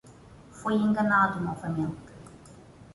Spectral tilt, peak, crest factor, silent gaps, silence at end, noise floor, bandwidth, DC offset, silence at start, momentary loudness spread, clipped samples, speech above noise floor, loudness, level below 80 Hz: -7 dB/octave; -10 dBFS; 18 dB; none; 0.1 s; -51 dBFS; 11.5 kHz; under 0.1%; 0.05 s; 22 LU; under 0.1%; 25 dB; -27 LUFS; -58 dBFS